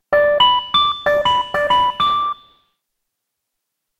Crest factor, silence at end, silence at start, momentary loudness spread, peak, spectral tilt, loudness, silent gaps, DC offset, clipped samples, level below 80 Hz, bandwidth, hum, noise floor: 16 dB; 1.65 s; 0.1 s; 7 LU; -2 dBFS; -3 dB/octave; -15 LUFS; none; under 0.1%; under 0.1%; -48 dBFS; 13.5 kHz; none; -78 dBFS